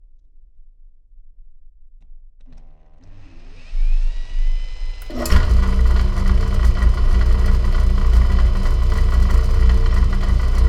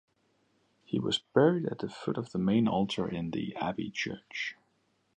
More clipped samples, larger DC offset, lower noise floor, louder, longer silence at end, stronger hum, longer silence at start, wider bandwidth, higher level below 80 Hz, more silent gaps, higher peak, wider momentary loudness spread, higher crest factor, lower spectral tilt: neither; neither; second, -44 dBFS vs -73 dBFS; first, -19 LUFS vs -31 LUFS; second, 0 s vs 0.65 s; neither; first, 1.4 s vs 0.9 s; about the same, 10 kHz vs 10 kHz; first, -16 dBFS vs -64 dBFS; neither; first, 0 dBFS vs -10 dBFS; about the same, 11 LU vs 11 LU; second, 16 dB vs 22 dB; about the same, -6.5 dB/octave vs -6 dB/octave